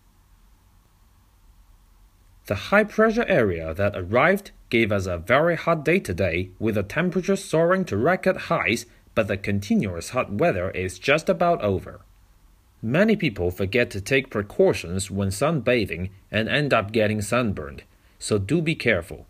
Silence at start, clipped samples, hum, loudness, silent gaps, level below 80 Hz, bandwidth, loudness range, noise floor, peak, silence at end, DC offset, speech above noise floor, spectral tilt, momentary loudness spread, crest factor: 2.45 s; under 0.1%; none; -23 LUFS; none; -48 dBFS; 15.5 kHz; 2 LU; -57 dBFS; -4 dBFS; 0.05 s; under 0.1%; 34 dB; -5.5 dB/octave; 7 LU; 20 dB